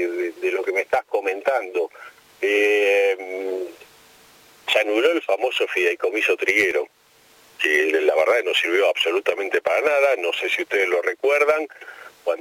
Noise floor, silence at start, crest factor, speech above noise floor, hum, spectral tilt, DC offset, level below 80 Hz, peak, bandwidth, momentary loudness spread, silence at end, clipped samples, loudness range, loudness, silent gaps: -54 dBFS; 0 s; 18 dB; 34 dB; none; -1.5 dB/octave; under 0.1%; -72 dBFS; -4 dBFS; 16.5 kHz; 10 LU; 0 s; under 0.1%; 3 LU; -20 LUFS; none